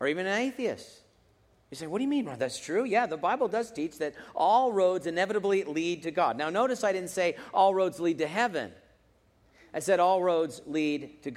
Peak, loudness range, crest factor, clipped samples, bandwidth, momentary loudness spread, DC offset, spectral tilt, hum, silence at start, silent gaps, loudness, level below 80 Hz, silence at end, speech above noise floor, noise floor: -12 dBFS; 4 LU; 18 dB; under 0.1%; 15 kHz; 11 LU; under 0.1%; -4.5 dB/octave; none; 0 s; none; -28 LUFS; -70 dBFS; 0 s; 37 dB; -65 dBFS